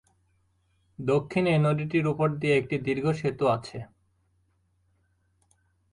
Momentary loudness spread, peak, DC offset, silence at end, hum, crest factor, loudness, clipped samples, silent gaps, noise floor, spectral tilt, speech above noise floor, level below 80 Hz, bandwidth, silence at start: 8 LU; -12 dBFS; under 0.1%; 2.05 s; none; 16 dB; -26 LUFS; under 0.1%; none; -69 dBFS; -7.5 dB/octave; 44 dB; -60 dBFS; 11 kHz; 1 s